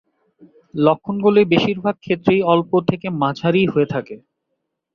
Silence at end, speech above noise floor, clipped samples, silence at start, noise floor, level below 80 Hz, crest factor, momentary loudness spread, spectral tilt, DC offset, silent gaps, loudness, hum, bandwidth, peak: 0.75 s; 58 dB; under 0.1%; 0.75 s; -75 dBFS; -56 dBFS; 18 dB; 8 LU; -8 dB/octave; under 0.1%; none; -18 LUFS; none; 6.8 kHz; -2 dBFS